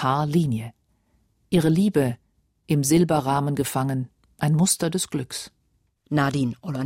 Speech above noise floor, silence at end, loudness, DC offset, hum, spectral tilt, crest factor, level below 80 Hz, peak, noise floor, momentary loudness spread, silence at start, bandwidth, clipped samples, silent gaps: 45 dB; 0 s; -23 LUFS; under 0.1%; none; -5.5 dB/octave; 16 dB; -54 dBFS; -8 dBFS; -66 dBFS; 13 LU; 0 s; 16 kHz; under 0.1%; none